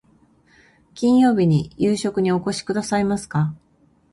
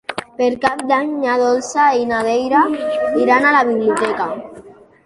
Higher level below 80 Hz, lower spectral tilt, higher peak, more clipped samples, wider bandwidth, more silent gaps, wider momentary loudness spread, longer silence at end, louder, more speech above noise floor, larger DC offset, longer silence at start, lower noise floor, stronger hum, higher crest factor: about the same, -52 dBFS vs -56 dBFS; first, -6.5 dB/octave vs -4 dB/octave; second, -8 dBFS vs -2 dBFS; neither; about the same, 11.5 kHz vs 11.5 kHz; neither; about the same, 8 LU vs 8 LU; first, 0.55 s vs 0.35 s; second, -20 LUFS vs -16 LUFS; first, 40 dB vs 25 dB; neither; first, 0.95 s vs 0.1 s; first, -59 dBFS vs -41 dBFS; neither; about the same, 14 dB vs 16 dB